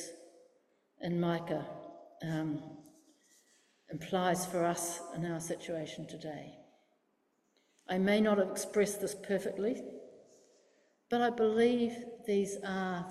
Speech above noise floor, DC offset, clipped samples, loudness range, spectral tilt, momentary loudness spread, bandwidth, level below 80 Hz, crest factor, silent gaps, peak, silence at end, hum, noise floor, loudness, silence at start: 43 dB; under 0.1%; under 0.1%; 6 LU; -5 dB/octave; 18 LU; 15.5 kHz; -74 dBFS; 18 dB; none; -18 dBFS; 0 s; none; -77 dBFS; -34 LUFS; 0 s